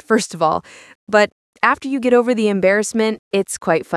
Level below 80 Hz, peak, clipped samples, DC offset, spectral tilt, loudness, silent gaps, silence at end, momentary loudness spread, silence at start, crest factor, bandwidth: -60 dBFS; 0 dBFS; under 0.1%; under 0.1%; -4.5 dB/octave; -17 LUFS; 0.95-1.07 s, 1.32-1.53 s, 3.19-3.31 s; 0 s; 5 LU; 0.1 s; 18 dB; 12 kHz